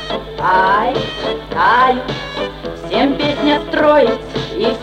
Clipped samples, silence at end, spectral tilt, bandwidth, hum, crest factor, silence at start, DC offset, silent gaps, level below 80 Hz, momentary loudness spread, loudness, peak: under 0.1%; 0 s; -5.5 dB/octave; 11 kHz; none; 14 dB; 0 s; under 0.1%; none; -38 dBFS; 12 LU; -15 LUFS; 0 dBFS